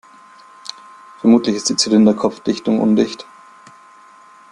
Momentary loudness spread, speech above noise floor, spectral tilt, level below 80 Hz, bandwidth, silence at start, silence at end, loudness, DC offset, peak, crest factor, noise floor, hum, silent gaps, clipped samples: 20 LU; 30 dB; -4.5 dB/octave; -60 dBFS; 11 kHz; 1.25 s; 1.3 s; -15 LUFS; under 0.1%; -2 dBFS; 16 dB; -45 dBFS; none; none; under 0.1%